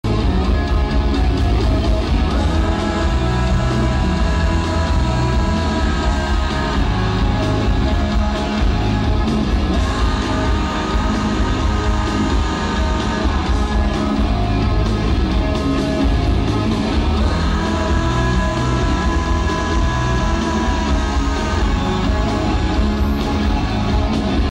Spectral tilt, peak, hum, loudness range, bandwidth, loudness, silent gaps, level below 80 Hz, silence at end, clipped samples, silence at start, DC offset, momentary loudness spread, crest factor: -6.5 dB/octave; -6 dBFS; none; 1 LU; 10 kHz; -18 LUFS; none; -20 dBFS; 0 s; under 0.1%; 0.05 s; under 0.1%; 1 LU; 12 dB